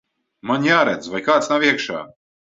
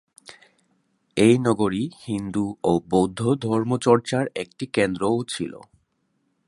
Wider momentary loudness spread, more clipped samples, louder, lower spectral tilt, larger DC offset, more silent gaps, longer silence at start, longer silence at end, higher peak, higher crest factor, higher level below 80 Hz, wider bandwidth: about the same, 12 LU vs 11 LU; neither; first, -18 LUFS vs -23 LUFS; second, -4.5 dB/octave vs -6 dB/octave; neither; neither; first, 0.45 s vs 0.3 s; second, 0.45 s vs 0.9 s; about the same, -2 dBFS vs -2 dBFS; about the same, 18 dB vs 20 dB; second, -62 dBFS vs -56 dBFS; second, 7.8 kHz vs 11.5 kHz